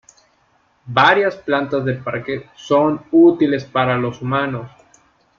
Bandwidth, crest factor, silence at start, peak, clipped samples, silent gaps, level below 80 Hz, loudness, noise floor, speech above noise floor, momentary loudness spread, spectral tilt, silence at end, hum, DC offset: 7.2 kHz; 18 dB; 0.85 s; 0 dBFS; under 0.1%; none; -56 dBFS; -17 LUFS; -59 dBFS; 43 dB; 12 LU; -7 dB/octave; 0.7 s; none; under 0.1%